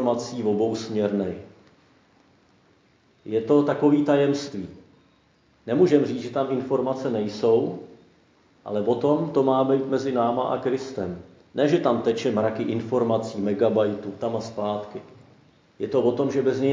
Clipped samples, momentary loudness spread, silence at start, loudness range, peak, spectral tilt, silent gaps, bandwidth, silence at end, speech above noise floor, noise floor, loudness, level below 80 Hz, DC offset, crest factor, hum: under 0.1%; 13 LU; 0 s; 3 LU; -6 dBFS; -7 dB/octave; none; 7.6 kHz; 0 s; 38 dB; -61 dBFS; -24 LUFS; -62 dBFS; under 0.1%; 18 dB; none